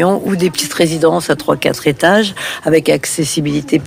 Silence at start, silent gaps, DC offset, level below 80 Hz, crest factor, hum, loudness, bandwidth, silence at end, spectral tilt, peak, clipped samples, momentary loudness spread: 0 s; none; under 0.1%; -46 dBFS; 12 dB; none; -14 LUFS; 16 kHz; 0 s; -4.5 dB/octave; -2 dBFS; under 0.1%; 4 LU